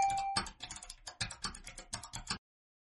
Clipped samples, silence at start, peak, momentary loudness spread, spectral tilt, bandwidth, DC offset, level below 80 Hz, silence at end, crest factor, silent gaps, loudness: under 0.1%; 0 s; -16 dBFS; 11 LU; -1.5 dB/octave; 11.5 kHz; under 0.1%; -56 dBFS; 0.45 s; 24 dB; none; -40 LUFS